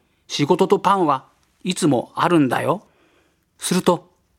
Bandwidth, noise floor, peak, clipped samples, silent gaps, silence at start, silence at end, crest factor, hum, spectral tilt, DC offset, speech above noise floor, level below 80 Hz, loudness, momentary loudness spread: 16.5 kHz; -61 dBFS; 0 dBFS; under 0.1%; none; 0.3 s; 0.4 s; 20 dB; none; -5 dB/octave; under 0.1%; 43 dB; -62 dBFS; -20 LUFS; 10 LU